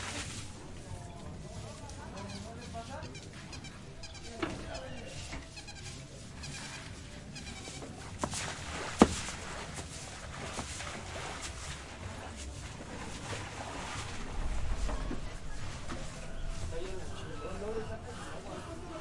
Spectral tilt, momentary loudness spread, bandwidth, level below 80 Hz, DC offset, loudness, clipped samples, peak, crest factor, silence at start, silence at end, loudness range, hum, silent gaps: -4.5 dB/octave; 7 LU; 11.5 kHz; -46 dBFS; under 0.1%; -40 LUFS; under 0.1%; -4 dBFS; 36 dB; 0 s; 0 s; 9 LU; none; none